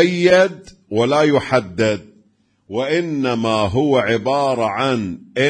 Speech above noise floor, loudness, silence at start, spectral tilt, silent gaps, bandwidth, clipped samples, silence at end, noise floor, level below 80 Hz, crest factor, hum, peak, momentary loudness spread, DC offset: 42 dB; -17 LUFS; 0 s; -5.5 dB/octave; none; 10.5 kHz; under 0.1%; 0 s; -58 dBFS; -52 dBFS; 16 dB; none; 0 dBFS; 10 LU; under 0.1%